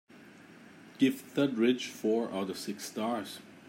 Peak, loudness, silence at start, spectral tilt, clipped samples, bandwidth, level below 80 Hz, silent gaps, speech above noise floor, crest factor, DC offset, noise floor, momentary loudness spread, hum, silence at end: -14 dBFS; -32 LUFS; 0.15 s; -5 dB/octave; under 0.1%; 16 kHz; -82 dBFS; none; 23 dB; 18 dB; under 0.1%; -54 dBFS; 10 LU; none; 0 s